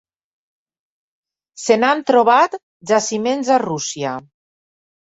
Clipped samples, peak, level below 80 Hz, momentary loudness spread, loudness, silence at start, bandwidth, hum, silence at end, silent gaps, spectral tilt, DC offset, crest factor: under 0.1%; -2 dBFS; -66 dBFS; 13 LU; -17 LUFS; 1.55 s; 8 kHz; none; 0.85 s; 2.63-2.80 s; -3.5 dB/octave; under 0.1%; 18 dB